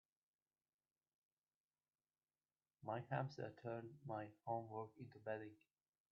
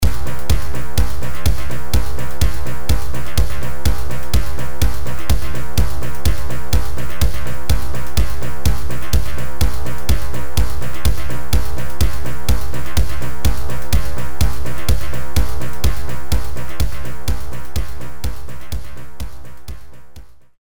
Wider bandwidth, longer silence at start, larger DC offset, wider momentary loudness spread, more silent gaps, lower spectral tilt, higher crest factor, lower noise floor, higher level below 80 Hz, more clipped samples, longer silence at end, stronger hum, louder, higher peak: second, 5.6 kHz vs over 20 kHz; first, 2.8 s vs 0 s; second, under 0.1% vs 30%; about the same, 9 LU vs 7 LU; neither; first, -6.5 dB/octave vs -5 dB/octave; first, 22 dB vs 12 dB; first, under -90 dBFS vs -39 dBFS; second, under -90 dBFS vs -22 dBFS; neither; first, 0.6 s vs 0 s; neither; second, -50 LUFS vs -23 LUFS; second, -30 dBFS vs -2 dBFS